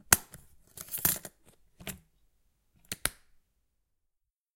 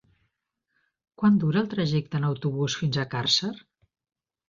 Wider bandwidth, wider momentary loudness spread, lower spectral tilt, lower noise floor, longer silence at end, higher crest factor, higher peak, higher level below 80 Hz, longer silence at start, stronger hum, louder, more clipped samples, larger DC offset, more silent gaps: first, 17 kHz vs 7.4 kHz; first, 25 LU vs 6 LU; second, -1 dB/octave vs -5.5 dB/octave; about the same, -82 dBFS vs -80 dBFS; first, 1.45 s vs 0.9 s; first, 34 dB vs 18 dB; first, -2 dBFS vs -10 dBFS; first, -56 dBFS vs -62 dBFS; second, 0.1 s vs 1.2 s; neither; second, -30 LUFS vs -25 LUFS; neither; neither; neither